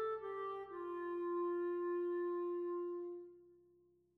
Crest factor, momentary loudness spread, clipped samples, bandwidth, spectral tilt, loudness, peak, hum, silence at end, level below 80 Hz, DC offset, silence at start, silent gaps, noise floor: 10 dB; 7 LU; under 0.1%; 4.1 kHz; -7.5 dB/octave; -42 LUFS; -32 dBFS; none; 0.6 s; -82 dBFS; under 0.1%; 0 s; none; -72 dBFS